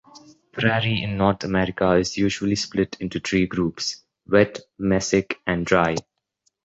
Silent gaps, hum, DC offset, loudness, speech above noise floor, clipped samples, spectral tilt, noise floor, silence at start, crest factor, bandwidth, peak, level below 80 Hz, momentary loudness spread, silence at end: none; none; under 0.1%; -22 LUFS; 49 dB; under 0.1%; -5 dB/octave; -71 dBFS; 0.15 s; 20 dB; 8.2 kHz; -2 dBFS; -46 dBFS; 8 LU; 0.65 s